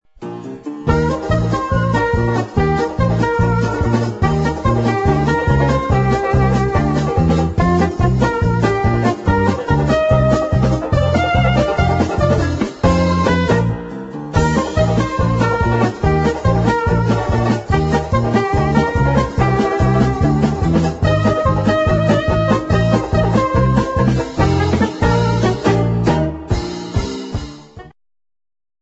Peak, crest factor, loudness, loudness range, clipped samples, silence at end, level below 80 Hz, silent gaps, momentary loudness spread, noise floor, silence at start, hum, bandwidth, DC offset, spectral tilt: 0 dBFS; 14 dB; -16 LUFS; 2 LU; under 0.1%; 0.9 s; -26 dBFS; none; 3 LU; -36 dBFS; 0.2 s; none; 8.2 kHz; under 0.1%; -7.5 dB/octave